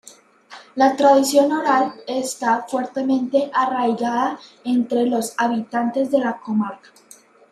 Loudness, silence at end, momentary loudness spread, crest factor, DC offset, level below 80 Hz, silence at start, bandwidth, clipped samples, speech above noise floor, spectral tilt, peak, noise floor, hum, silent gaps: -20 LUFS; 0.75 s; 10 LU; 18 dB; under 0.1%; -72 dBFS; 0.5 s; 14.5 kHz; under 0.1%; 30 dB; -4 dB/octave; -2 dBFS; -49 dBFS; none; none